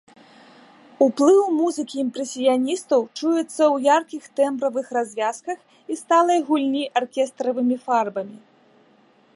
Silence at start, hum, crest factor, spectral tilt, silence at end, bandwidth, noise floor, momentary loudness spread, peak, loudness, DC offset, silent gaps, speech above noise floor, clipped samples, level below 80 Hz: 1 s; none; 18 dB; -3.5 dB/octave; 1 s; 11.5 kHz; -57 dBFS; 12 LU; -4 dBFS; -21 LUFS; under 0.1%; none; 36 dB; under 0.1%; -80 dBFS